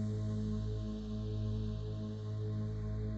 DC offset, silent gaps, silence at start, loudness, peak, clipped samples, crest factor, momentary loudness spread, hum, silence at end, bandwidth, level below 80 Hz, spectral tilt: under 0.1%; none; 0 s; -39 LUFS; -28 dBFS; under 0.1%; 10 dB; 3 LU; none; 0 s; 7.6 kHz; -46 dBFS; -9 dB/octave